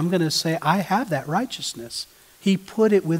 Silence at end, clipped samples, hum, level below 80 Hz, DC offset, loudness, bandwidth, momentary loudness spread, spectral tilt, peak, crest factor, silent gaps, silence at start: 0 s; under 0.1%; none; -64 dBFS; under 0.1%; -23 LUFS; 16 kHz; 11 LU; -5 dB/octave; -4 dBFS; 18 dB; none; 0 s